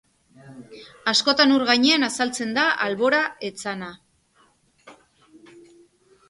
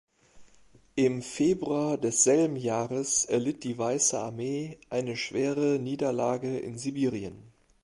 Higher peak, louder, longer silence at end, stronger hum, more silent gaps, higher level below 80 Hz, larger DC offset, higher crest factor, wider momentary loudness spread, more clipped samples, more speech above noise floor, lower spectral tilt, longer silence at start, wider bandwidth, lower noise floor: first, -4 dBFS vs -10 dBFS; first, -20 LUFS vs -28 LUFS; first, 1.35 s vs 0.35 s; neither; neither; about the same, -68 dBFS vs -64 dBFS; neither; about the same, 20 dB vs 20 dB; first, 14 LU vs 10 LU; neither; first, 40 dB vs 32 dB; second, -2.5 dB/octave vs -4 dB/octave; about the same, 0.45 s vs 0.35 s; about the same, 11.5 kHz vs 11.5 kHz; about the same, -61 dBFS vs -60 dBFS